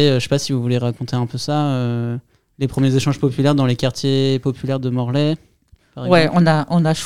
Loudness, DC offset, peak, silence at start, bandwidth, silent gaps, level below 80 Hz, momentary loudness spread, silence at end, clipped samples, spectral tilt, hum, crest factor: -18 LUFS; 0.7%; 0 dBFS; 0 s; 13.5 kHz; none; -50 dBFS; 8 LU; 0 s; under 0.1%; -6.5 dB/octave; none; 18 dB